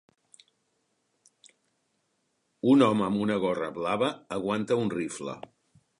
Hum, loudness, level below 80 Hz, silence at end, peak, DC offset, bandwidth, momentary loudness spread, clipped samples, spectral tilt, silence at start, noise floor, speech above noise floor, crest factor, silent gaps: none; -27 LUFS; -68 dBFS; 0.6 s; -8 dBFS; under 0.1%; 11 kHz; 13 LU; under 0.1%; -6 dB/octave; 2.65 s; -75 dBFS; 49 dB; 22 dB; none